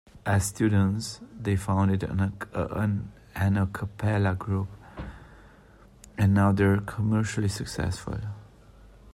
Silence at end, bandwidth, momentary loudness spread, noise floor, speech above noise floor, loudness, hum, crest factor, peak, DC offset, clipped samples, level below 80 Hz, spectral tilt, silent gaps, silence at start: 0 s; 13 kHz; 15 LU; -53 dBFS; 28 dB; -27 LUFS; none; 16 dB; -12 dBFS; under 0.1%; under 0.1%; -50 dBFS; -6.5 dB/octave; none; 0.15 s